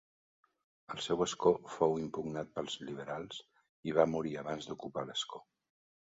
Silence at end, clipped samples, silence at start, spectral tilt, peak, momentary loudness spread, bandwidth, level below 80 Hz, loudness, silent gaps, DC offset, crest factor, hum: 0.75 s; under 0.1%; 0.9 s; -4 dB/octave; -12 dBFS; 13 LU; 7.6 kHz; -68 dBFS; -36 LUFS; 3.69-3.83 s; under 0.1%; 24 dB; none